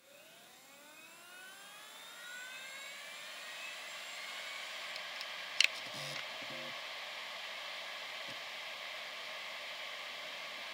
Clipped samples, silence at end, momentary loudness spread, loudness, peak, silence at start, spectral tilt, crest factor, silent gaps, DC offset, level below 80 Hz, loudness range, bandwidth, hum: under 0.1%; 0 s; 11 LU; -41 LUFS; -8 dBFS; 0 s; 0 dB/octave; 36 dB; none; under 0.1%; under -90 dBFS; 9 LU; 16 kHz; none